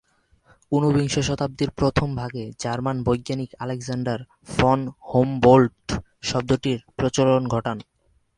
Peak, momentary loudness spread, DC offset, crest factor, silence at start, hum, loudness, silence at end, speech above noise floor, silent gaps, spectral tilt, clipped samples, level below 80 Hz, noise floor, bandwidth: -2 dBFS; 12 LU; under 0.1%; 22 dB; 0.7 s; none; -23 LUFS; 0.55 s; 38 dB; none; -6 dB/octave; under 0.1%; -44 dBFS; -60 dBFS; 11 kHz